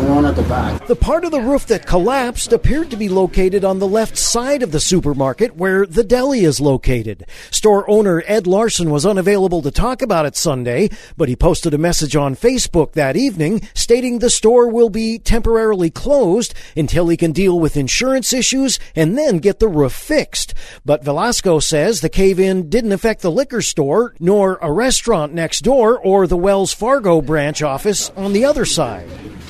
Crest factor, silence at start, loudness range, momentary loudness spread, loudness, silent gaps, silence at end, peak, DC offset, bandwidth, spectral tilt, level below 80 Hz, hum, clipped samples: 14 dB; 0 s; 2 LU; 5 LU; -15 LUFS; none; 0 s; 0 dBFS; under 0.1%; 13.5 kHz; -4.5 dB/octave; -28 dBFS; none; under 0.1%